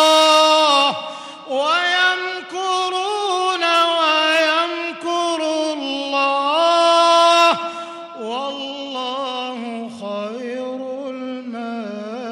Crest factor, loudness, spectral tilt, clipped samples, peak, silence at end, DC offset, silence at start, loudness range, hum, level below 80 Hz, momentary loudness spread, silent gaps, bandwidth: 14 dB; -17 LUFS; -1.5 dB/octave; under 0.1%; -4 dBFS; 0 s; under 0.1%; 0 s; 10 LU; none; -78 dBFS; 16 LU; none; 16 kHz